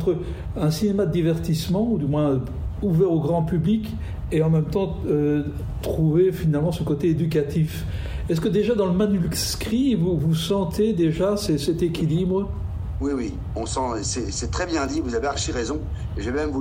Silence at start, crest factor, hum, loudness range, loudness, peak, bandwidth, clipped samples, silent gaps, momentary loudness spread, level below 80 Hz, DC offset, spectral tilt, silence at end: 0 s; 12 dB; none; 4 LU; -23 LUFS; -10 dBFS; 16 kHz; under 0.1%; none; 8 LU; -36 dBFS; under 0.1%; -6.5 dB/octave; 0 s